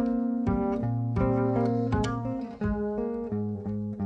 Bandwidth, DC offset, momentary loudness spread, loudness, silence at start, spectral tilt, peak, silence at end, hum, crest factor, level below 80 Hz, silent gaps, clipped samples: 8.6 kHz; under 0.1%; 6 LU; -29 LUFS; 0 s; -9 dB/octave; -14 dBFS; 0 s; none; 14 dB; -42 dBFS; none; under 0.1%